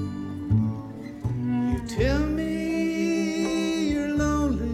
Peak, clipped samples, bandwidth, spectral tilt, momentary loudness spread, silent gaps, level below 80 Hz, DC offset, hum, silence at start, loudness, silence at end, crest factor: -12 dBFS; under 0.1%; 14.5 kHz; -6.5 dB/octave; 8 LU; none; -36 dBFS; under 0.1%; none; 0 s; -26 LUFS; 0 s; 14 dB